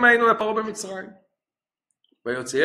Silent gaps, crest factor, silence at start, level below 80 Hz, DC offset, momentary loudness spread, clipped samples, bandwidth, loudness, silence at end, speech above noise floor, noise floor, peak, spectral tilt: none; 20 dB; 0 s; -66 dBFS; under 0.1%; 19 LU; under 0.1%; 13.5 kHz; -23 LUFS; 0 s; over 69 dB; under -90 dBFS; -2 dBFS; -3 dB/octave